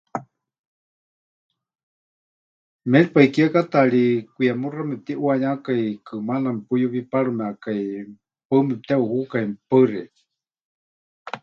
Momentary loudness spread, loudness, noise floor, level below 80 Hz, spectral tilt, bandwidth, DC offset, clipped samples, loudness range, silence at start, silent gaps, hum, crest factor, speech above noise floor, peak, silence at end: 14 LU; -21 LUFS; under -90 dBFS; -70 dBFS; -8.5 dB/octave; 7.2 kHz; under 0.1%; under 0.1%; 5 LU; 0.15 s; 0.59-1.49 s, 1.83-2.79 s, 8.45-8.50 s, 10.61-11.25 s; none; 22 dB; over 70 dB; 0 dBFS; 0.05 s